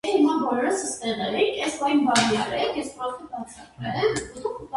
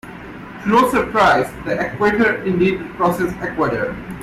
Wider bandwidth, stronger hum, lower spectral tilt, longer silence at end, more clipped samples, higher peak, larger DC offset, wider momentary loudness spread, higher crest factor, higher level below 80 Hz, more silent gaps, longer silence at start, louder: second, 11.5 kHz vs 16 kHz; neither; second, -3.5 dB/octave vs -6 dB/octave; about the same, 0 s vs 0 s; neither; about the same, -6 dBFS vs -4 dBFS; neither; first, 14 LU vs 11 LU; about the same, 18 dB vs 14 dB; second, -56 dBFS vs -42 dBFS; neither; about the same, 0.05 s vs 0.05 s; second, -24 LUFS vs -17 LUFS